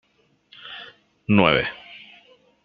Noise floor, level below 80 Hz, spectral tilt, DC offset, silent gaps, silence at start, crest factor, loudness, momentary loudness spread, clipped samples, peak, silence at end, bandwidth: -63 dBFS; -54 dBFS; -8.5 dB/octave; under 0.1%; none; 0.65 s; 24 dB; -19 LUFS; 26 LU; under 0.1%; 0 dBFS; 0.7 s; 5 kHz